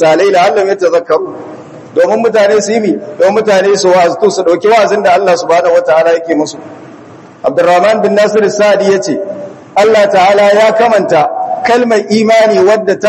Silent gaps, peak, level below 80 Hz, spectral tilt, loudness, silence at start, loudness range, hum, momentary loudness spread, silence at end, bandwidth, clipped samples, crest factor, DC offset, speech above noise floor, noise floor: none; 0 dBFS; -58 dBFS; -4.5 dB/octave; -9 LUFS; 0 s; 2 LU; none; 8 LU; 0 s; 12 kHz; 2%; 8 dB; under 0.1%; 25 dB; -33 dBFS